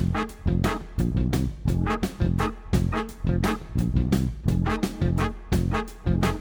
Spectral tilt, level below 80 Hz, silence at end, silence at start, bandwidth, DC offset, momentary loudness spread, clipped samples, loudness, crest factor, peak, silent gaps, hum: -7 dB/octave; -32 dBFS; 0 s; 0 s; over 20 kHz; under 0.1%; 3 LU; under 0.1%; -26 LUFS; 14 dB; -10 dBFS; none; none